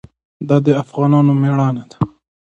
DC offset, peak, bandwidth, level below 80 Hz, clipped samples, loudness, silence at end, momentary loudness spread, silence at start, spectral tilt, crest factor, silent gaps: under 0.1%; 0 dBFS; 7.8 kHz; -52 dBFS; under 0.1%; -15 LUFS; 0.45 s; 11 LU; 0.4 s; -9.5 dB/octave; 16 dB; none